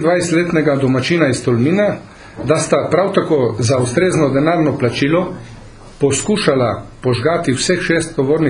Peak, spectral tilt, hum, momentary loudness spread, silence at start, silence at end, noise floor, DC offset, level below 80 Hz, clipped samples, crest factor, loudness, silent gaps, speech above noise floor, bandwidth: 0 dBFS; -5.5 dB/octave; none; 5 LU; 0 s; 0 s; -36 dBFS; under 0.1%; -44 dBFS; under 0.1%; 14 dB; -15 LUFS; none; 21 dB; 11 kHz